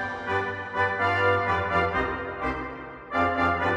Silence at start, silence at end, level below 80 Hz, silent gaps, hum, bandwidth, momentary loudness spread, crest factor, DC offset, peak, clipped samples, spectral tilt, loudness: 0 s; 0 s; -48 dBFS; none; none; 9.6 kHz; 8 LU; 16 dB; under 0.1%; -10 dBFS; under 0.1%; -6.5 dB/octave; -26 LUFS